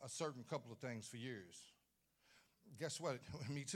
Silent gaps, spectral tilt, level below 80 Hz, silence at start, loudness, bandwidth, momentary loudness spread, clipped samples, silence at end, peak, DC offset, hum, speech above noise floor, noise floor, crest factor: none; -4 dB/octave; -82 dBFS; 0 s; -49 LUFS; 17 kHz; 15 LU; under 0.1%; 0 s; -30 dBFS; under 0.1%; none; 33 dB; -82 dBFS; 20 dB